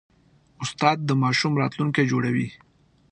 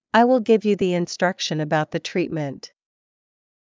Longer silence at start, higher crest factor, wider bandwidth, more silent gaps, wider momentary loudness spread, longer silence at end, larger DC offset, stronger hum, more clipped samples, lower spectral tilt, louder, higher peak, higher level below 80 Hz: first, 0.6 s vs 0.15 s; about the same, 20 dB vs 20 dB; first, 9.4 kHz vs 7.6 kHz; neither; about the same, 11 LU vs 11 LU; second, 0.55 s vs 1 s; neither; neither; neither; about the same, -5.5 dB/octave vs -5.5 dB/octave; about the same, -23 LUFS vs -21 LUFS; about the same, -4 dBFS vs -2 dBFS; about the same, -62 dBFS vs -64 dBFS